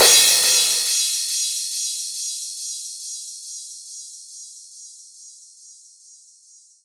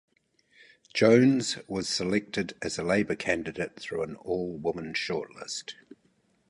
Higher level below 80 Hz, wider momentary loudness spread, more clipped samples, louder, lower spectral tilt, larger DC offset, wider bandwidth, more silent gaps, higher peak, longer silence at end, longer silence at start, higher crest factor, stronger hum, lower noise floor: second, -68 dBFS vs -60 dBFS; first, 25 LU vs 15 LU; neither; first, -18 LUFS vs -28 LUFS; second, 3 dB/octave vs -4.5 dB/octave; neither; first, over 20 kHz vs 11.5 kHz; neither; first, 0 dBFS vs -8 dBFS; first, 1.1 s vs 0.75 s; second, 0 s vs 0.95 s; about the same, 22 dB vs 22 dB; neither; second, -52 dBFS vs -68 dBFS